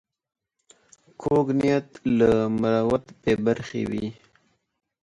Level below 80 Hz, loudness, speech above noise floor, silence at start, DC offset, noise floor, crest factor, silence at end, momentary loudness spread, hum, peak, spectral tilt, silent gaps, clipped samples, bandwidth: -52 dBFS; -24 LUFS; 43 dB; 1.2 s; under 0.1%; -66 dBFS; 18 dB; 0.9 s; 9 LU; none; -8 dBFS; -7.5 dB/octave; none; under 0.1%; 10.5 kHz